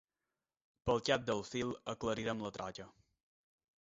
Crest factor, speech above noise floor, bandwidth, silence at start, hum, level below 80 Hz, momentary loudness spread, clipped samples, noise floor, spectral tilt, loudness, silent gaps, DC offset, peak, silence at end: 24 dB; over 52 dB; 7.6 kHz; 0.85 s; none; -64 dBFS; 13 LU; under 0.1%; under -90 dBFS; -3.5 dB/octave; -38 LUFS; none; under 0.1%; -16 dBFS; 0.9 s